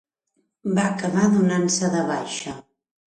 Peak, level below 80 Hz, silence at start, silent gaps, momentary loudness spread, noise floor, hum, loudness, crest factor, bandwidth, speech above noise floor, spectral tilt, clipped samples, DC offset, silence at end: -6 dBFS; -64 dBFS; 0.65 s; none; 14 LU; -72 dBFS; none; -22 LUFS; 16 dB; 9.8 kHz; 51 dB; -5 dB/octave; under 0.1%; under 0.1%; 0.55 s